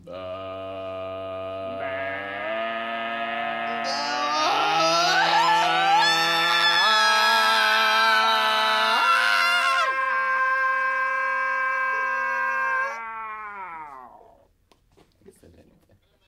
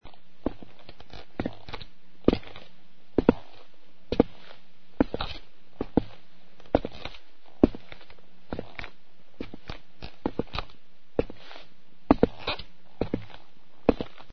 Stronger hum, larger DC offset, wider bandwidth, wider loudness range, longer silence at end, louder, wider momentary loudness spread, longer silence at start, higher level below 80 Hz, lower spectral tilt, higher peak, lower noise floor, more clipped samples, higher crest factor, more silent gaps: neither; second, under 0.1% vs 2%; first, 16 kHz vs 6.4 kHz; first, 12 LU vs 7 LU; first, 2.2 s vs 0 s; first, -21 LUFS vs -30 LUFS; second, 16 LU vs 23 LU; about the same, 0.05 s vs 0 s; second, -68 dBFS vs -44 dBFS; second, -1 dB/octave vs -5.5 dB/octave; second, -6 dBFS vs 0 dBFS; about the same, -62 dBFS vs -60 dBFS; neither; second, 16 dB vs 32 dB; neither